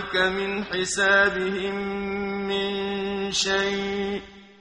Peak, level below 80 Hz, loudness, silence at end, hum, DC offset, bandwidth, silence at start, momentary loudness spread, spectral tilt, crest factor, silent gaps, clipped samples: -8 dBFS; -52 dBFS; -24 LUFS; 0.15 s; none; under 0.1%; 11 kHz; 0 s; 9 LU; -3 dB/octave; 18 dB; none; under 0.1%